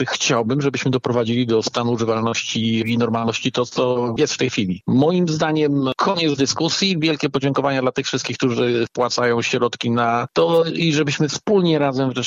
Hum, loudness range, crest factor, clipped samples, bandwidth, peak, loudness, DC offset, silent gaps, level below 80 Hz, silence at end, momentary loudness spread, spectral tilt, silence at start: none; 1 LU; 14 dB; under 0.1%; 8.2 kHz; -6 dBFS; -19 LUFS; under 0.1%; none; -58 dBFS; 0 s; 3 LU; -5 dB/octave; 0 s